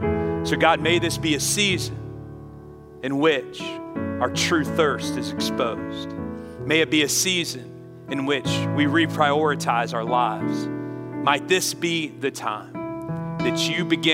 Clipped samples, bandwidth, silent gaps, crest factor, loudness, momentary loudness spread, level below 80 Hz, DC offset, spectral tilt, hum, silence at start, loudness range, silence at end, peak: under 0.1%; 16 kHz; none; 22 dB; -23 LUFS; 14 LU; -52 dBFS; under 0.1%; -4 dB/octave; none; 0 s; 3 LU; 0 s; -2 dBFS